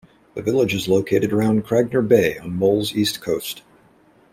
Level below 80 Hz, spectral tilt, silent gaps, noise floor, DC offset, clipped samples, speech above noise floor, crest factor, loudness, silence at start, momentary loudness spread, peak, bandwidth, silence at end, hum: -54 dBFS; -5.5 dB/octave; none; -54 dBFS; under 0.1%; under 0.1%; 35 dB; 18 dB; -20 LUFS; 0.35 s; 9 LU; -2 dBFS; 16 kHz; 0.75 s; none